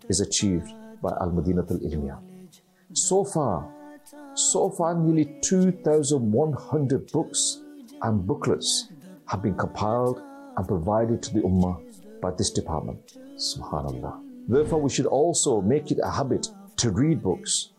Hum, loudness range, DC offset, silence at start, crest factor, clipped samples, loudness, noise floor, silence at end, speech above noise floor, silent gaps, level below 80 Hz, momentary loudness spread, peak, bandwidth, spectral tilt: none; 4 LU; under 0.1%; 0.05 s; 14 dB; under 0.1%; -25 LUFS; -52 dBFS; 0.15 s; 27 dB; none; -50 dBFS; 13 LU; -12 dBFS; 13.5 kHz; -5 dB/octave